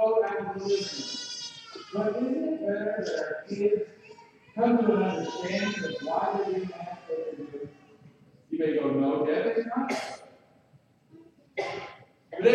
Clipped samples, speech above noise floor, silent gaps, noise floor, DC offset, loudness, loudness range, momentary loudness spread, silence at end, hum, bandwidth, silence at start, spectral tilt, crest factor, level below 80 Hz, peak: under 0.1%; 34 dB; none; -61 dBFS; under 0.1%; -29 LUFS; 4 LU; 14 LU; 0 s; none; 10 kHz; 0 s; -5 dB/octave; 20 dB; -74 dBFS; -8 dBFS